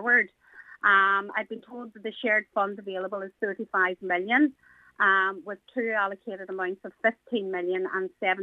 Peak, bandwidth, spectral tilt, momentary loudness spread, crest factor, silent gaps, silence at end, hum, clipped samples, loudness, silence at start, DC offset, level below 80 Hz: -8 dBFS; 6.8 kHz; -6 dB/octave; 14 LU; 20 dB; none; 0 s; none; under 0.1%; -26 LUFS; 0 s; under 0.1%; -80 dBFS